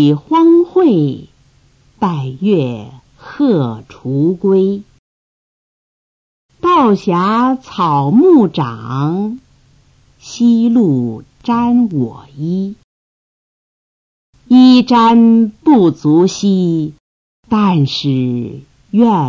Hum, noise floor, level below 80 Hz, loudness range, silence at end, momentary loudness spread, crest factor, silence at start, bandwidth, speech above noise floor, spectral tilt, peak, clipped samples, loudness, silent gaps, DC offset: none; -50 dBFS; -52 dBFS; 7 LU; 0 s; 14 LU; 14 dB; 0 s; 7.4 kHz; 39 dB; -7.5 dB/octave; 0 dBFS; under 0.1%; -12 LUFS; 4.99-6.49 s, 12.84-14.33 s, 17.00-17.43 s; under 0.1%